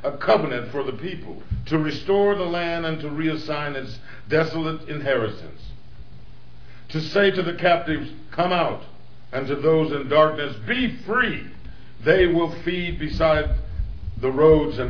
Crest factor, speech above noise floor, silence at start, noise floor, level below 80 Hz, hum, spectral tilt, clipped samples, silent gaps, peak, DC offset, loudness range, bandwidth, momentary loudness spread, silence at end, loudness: 20 dB; 25 dB; 0 s; -47 dBFS; -38 dBFS; none; -7.5 dB/octave; under 0.1%; none; -2 dBFS; 2%; 5 LU; 5.4 kHz; 14 LU; 0 s; -22 LUFS